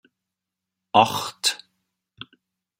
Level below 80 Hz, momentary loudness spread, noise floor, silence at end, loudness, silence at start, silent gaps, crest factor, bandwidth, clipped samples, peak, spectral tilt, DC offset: -70 dBFS; 24 LU; -85 dBFS; 1.25 s; -21 LUFS; 0.95 s; none; 24 dB; 16 kHz; under 0.1%; -2 dBFS; -2.5 dB/octave; under 0.1%